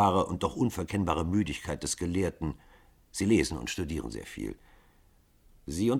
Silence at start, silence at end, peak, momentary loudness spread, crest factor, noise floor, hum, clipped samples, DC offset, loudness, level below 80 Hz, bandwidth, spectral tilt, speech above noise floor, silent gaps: 0 s; 0 s; -10 dBFS; 14 LU; 20 dB; -63 dBFS; none; under 0.1%; under 0.1%; -31 LUFS; -48 dBFS; 17 kHz; -5.5 dB/octave; 33 dB; none